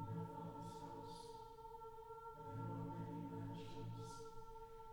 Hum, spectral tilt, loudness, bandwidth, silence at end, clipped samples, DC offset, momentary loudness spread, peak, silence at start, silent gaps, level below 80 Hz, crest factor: none; -7 dB/octave; -53 LUFS; 19 kHz; 0 s; under 0.1%; under 0.1%; 8 LU; -38 dBFS; 0 s; none; -66 dBFS; 14 dB